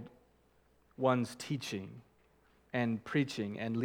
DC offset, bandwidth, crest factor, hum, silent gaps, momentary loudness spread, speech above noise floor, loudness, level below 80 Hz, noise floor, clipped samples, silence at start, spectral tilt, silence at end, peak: under 0.1%; 17 kHz; 20 dB; none; none; 16 LU; 34 dB; -36 LUFS; -74 dBFS; -69 dBFS; under 0.1%; 0 s; -6 dB/octave; 0 s; -16 dBFS